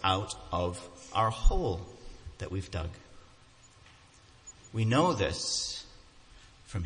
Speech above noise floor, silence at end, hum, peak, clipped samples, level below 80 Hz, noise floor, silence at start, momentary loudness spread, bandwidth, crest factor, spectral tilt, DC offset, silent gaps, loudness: 28 dB; 0 s; none; -10 dBFS; under 0.1%; -38 dBFS; -58 dBFS; 0 s; 23 LU; 10.5 kHz; 22 dB; -4.5 dB/octave; under 0.1%; none; -32 LUFS